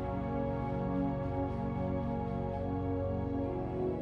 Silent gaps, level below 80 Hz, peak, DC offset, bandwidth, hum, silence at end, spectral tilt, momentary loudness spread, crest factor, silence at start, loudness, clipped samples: none; -46 dBFS; -22 dBFS; under 0.1%; 5.8 kHz; none; 0 s; -10.5 dB/octave; 2 LU; 12 dB; 0 s; -35 LUFS; under 0.1%